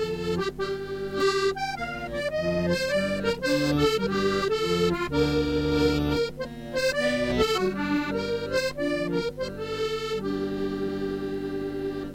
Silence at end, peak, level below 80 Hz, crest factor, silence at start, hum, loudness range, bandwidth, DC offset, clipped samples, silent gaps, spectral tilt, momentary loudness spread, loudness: 0 s; -10 dBFS; -44 dBFS; 16 dB; 0 s; none; 4 LU; 16 kHz; under 0.1%; under 0.1%; none; -5.5 dB/octave; 7 LU; -27 LUFS